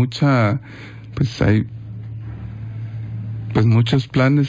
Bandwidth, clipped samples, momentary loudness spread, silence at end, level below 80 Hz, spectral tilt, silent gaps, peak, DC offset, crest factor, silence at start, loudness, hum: 7.8 kHz; under 0.1%; 16 LU; 0 s; -40 dBFS; -8 dB/octave; none; -4 dBFS; under 0.1%; 14 dB; 0 s; -19 LUFS; none